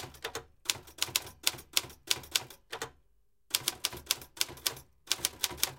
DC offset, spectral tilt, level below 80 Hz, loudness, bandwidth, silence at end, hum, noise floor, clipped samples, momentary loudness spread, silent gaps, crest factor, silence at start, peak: under 0.1%; 0 dB/octave; -62 dBFS; -33 LUFS; 17 kHz; 0 s; none; -73 dBFS; under 0.1%; 11 LU; none; 32 dB; 0 s; -4 dBFS